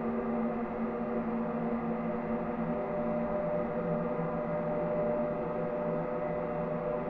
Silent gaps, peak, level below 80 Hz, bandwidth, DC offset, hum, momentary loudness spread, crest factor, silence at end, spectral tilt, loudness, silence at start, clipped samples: none; -20 dBFS; -56 dBFS; 4.6 kHz; under 0.1%; none; 2 LU; 12 dB; 0 s; -11 dB/octave; -33 LUFS; 0 s; under 0.1%